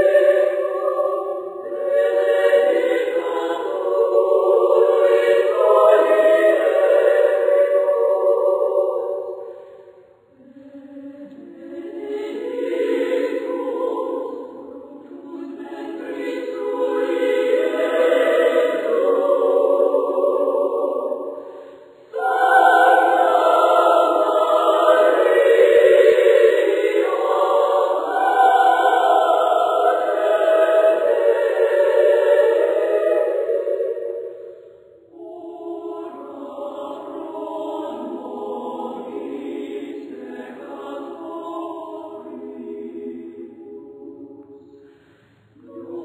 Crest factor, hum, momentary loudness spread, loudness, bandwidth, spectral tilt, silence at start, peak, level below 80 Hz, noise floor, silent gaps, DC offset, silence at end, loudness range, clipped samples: 18 dB; none; 20 LU; -17 LUFS; 15 kHz; -3.5 dB/octave; 0 s; -2 dBFS; -74 dBFS; -54 dBFS; none; under 0.1%; 0 s; 18 LU; under 0.1%